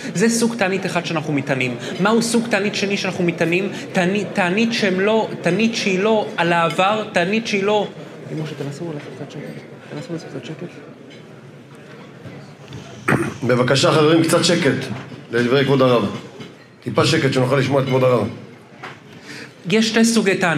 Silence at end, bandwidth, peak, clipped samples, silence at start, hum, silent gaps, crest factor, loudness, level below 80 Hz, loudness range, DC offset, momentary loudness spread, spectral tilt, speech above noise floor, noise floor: 0 s; 15 kHz; -2 dBFS; under 0.1%; 0 s; none; none; 18 dB; -18 LUFS; -64 dBFS; 14 LU; under 0.1%; 21 LU; -5 dB/octave; 22 dB; -40 dBFS